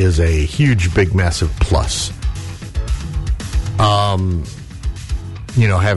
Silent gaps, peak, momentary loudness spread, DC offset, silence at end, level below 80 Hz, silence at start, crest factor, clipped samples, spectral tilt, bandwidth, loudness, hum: none; -4 dBFS; 12 LU; under 0.1%; 0 s; -22 dBFS; 0 s; 12 dB; under 0.1%; -5.5 dB/octave; 11.5 kHz; -18 LUFS; none